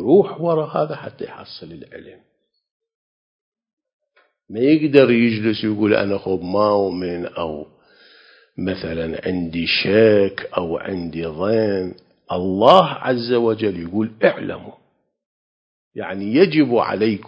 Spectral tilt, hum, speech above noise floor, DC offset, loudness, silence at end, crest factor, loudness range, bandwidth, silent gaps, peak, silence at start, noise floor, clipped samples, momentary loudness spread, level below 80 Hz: -8 dB/octave; none; 32 dB; under 0.1%; -18 LUFS; 0 s; 20 dB; 7 LU; 8 kHz; 2.71-2.80 s, 2.95-3.52 s, 3.73-3.77 s, 3.93-4.00 s, 15.26-15.91 s; 0 dBFS; 0 s; -50 dBFS; under 0.1%; 19 LU; -50 dBFS